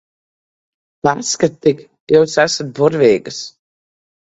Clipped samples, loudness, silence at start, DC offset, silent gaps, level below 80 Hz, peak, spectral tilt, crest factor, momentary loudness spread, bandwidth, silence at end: under 0.1%; -15 LUFS; 1.05 s; under 0.1%; 2.00-2.07 s; -56 dBFS; 0 dBFS; -4 dB/octave; 18 dB; 15 LU; 8.2 kHz; 0.85 s